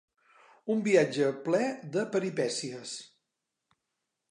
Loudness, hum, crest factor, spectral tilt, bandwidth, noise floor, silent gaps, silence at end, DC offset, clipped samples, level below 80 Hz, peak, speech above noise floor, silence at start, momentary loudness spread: -29 LUFS; none; 20 dB; -5 dB/octave; 11 kHz; -85 dBFS; none; 1.25 s; under 0.1%; under 0.1%; -84 dBFS; -12 dBFS; 56 dB; 0.65 s; 15 LU